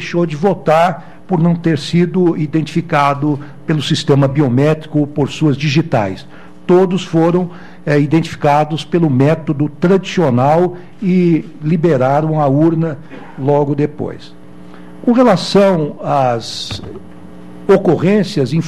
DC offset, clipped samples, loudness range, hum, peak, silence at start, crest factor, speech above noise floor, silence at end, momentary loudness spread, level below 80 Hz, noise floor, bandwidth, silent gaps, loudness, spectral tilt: 2%; under 0.1%; 2 LU; none; 0 dBFS; 0 s; 14 dB; 23 dB; 0 s; 10 LU; -48 dBFS; -36 dBFS; 11 kHz; none; -14 LUFS; -7 dB/octave